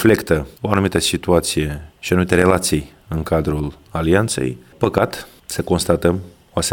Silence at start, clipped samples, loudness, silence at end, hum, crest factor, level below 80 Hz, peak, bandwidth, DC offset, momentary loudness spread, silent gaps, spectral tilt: 0 s; under 0.1%; -19 LUFS; 0 s; none; 18 dB; -36 dBFS; 0 dBFS; 18 kHz; under 0.1%; 11 LU; none; -5 dB/octave